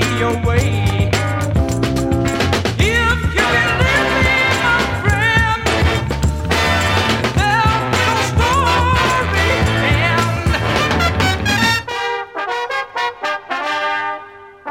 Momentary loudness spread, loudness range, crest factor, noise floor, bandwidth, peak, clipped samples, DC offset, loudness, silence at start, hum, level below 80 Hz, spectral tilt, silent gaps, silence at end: 7 LU; 3 LU; 16 dB; -36 dBFS; 16.5 kHz; 0 dBFS; under 0.1%; under 0.1%; -15 LUFS; 0 s; none; -26 dBFS; -4.5 dB/octave; none; 0 s